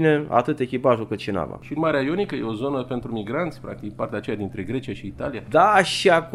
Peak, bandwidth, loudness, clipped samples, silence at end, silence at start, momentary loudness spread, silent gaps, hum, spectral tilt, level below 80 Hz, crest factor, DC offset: -2 dBFS; 13.5 kHz; -23 LUFS; under 0.1%; 0 s; 0 s; 13 LU; none; none; -5.5 dB/octave; -52 dBFS; 20 dB; under 0.1%